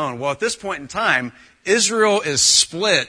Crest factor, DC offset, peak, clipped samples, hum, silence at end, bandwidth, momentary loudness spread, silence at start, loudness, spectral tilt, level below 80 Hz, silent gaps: 18 dB; under 0.1%; -2 dBFS; under 0.1%; none; 0 s; 10.5 kHz; 13 LU; 0 s; -17 LUFS; -1 dB/octave; -56 dBFS; none